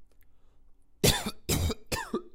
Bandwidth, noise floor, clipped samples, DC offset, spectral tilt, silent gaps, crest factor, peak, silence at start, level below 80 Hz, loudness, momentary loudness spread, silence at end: 16 kHz; -55 dBFS; under 0.1%; under 0.1%; -3.5 dB/octave; none; 24 dB; -8 dBFS; 0 s; -42 dBFS; -29 LUFS; 8 LU; 0.05 s